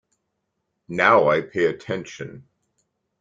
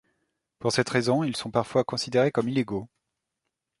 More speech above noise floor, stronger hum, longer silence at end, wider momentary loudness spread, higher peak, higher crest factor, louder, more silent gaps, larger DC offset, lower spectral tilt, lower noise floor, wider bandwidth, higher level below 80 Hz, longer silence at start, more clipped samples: about the same, 56 dB vs 58 dB; neither; second, 0.8 s vs 0.95 s; first, 20 LU vs 7 LU; first, -2 dBFS vs -8 dBFS; about the same, 22 dB vs 20 dB; first, -20 LUFS vs -26 LUFS; neither; neither; about the same, -5.5 dB/octave vs -5 dB/octave; second, -77 dBFS vs -83 dBFS; second, 7.6 kHz vs 11.5 kHz; about the same, -62 dBFS vs -62 dBFS; first, 0.9 s vs 0.6 s; neither